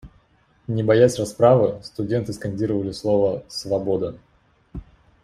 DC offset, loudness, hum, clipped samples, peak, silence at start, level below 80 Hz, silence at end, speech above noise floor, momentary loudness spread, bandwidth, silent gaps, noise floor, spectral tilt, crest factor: under 0.1%; -21 LUFS; none; under 0.1%; -4 dBFS; 0.05 s; -50 dBFS; 0.4 s; 39 dB; 23 LU; 14.5 kHz; none; -59 dBFS; -6.5 dB/octave; 18 dB